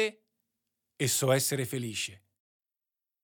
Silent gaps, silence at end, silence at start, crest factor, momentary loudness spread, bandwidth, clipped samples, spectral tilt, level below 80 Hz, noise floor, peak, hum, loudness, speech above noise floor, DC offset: none; 1.05 s; 0 s; 20 dB; 9 LU; 18 kHz; under 0.1%; -3.5 dB/octave; -82 dBFS; under -90 dBFS; -12 dBFS; none; -30 LUFS; over 60 dB; under 0.1%